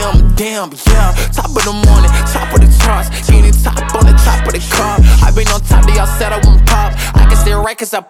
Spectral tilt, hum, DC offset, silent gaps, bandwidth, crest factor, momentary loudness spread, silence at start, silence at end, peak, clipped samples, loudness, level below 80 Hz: -5 dB/octave; none; under 0.1%; none; 16 kHz; 8 dB; 6 LU; 0 s; 0.1 s; 0 dBFS; under 0.1%; -11 LUFS; -8 dBFS